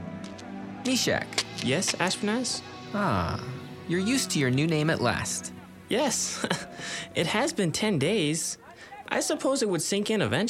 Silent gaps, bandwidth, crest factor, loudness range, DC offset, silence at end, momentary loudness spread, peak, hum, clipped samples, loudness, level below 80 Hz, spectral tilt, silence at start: none; 16 kHz; 20 dB; 1 LU; under 0.1%; 0 s; 14 LU; -8 dBFS; none; under 0.1%; -27 LUFS; -58 dBFS; -4 dB/octave; 0 s